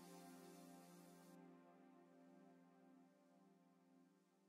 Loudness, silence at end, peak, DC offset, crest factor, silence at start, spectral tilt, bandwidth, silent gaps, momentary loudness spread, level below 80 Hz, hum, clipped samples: -65 LUFS; 0 s; -52 dBFS; under 0.1%; 16 dB; 0 s; -5 dB/octave; 16 kHz; none; 7 LU; under -90 dBFS; none; under 0.1%